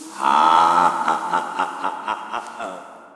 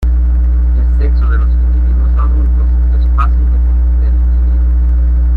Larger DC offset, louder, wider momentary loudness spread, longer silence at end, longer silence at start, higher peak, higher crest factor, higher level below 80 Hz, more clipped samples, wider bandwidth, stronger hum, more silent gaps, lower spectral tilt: neither; second, -19 LUFS vs -13 LUFS; first, 17 LU vs 1 LU; about the same, 0.05 s vs 0 s; about the same, 0 s vs 0 s; about the same, 0 dBFS vs -2 dBFS; first, 20 dB vs 6 dB; second, -74 dBFS vs -10 dBFS; neither; first, 12.5 kHz vs 2.6 kHz; second, none vs 60 Hz at -10 dBFS; neither; second, -3 dB/octave vs -10 dB/octave